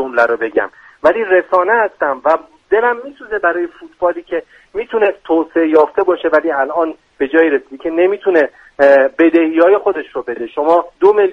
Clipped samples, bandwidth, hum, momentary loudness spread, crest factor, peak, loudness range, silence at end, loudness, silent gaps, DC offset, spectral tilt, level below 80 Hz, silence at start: under 0.1%; 6.4 kHz; none; 11 LU; 14 dB; 0 dBFS; 4 LU; 0 s; -14 LUFS; none; under 0.1%; -6 dB/octave; -54 dBFS; 0 s